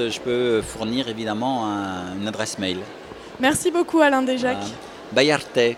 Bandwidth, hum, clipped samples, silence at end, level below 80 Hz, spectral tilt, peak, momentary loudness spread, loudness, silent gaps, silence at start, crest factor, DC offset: 16 kHz; none; under 0.1%; 0 s; -54 dBFS; -4 dB/octave; -2 dBFS; 13 LU; -22 LUFS; none; 0 s; 22 dB; under 0.1%